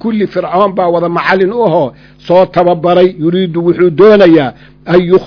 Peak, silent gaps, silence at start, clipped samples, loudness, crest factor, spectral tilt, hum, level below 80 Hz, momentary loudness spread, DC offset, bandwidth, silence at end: 0 dBFS; none; 0.05 s; 3%; -9 LUFS; 8 dB; -8.5 dB/octave; none; -44 dBFS; 8 LU; under 0.1%; 5.4 kHz; 0 s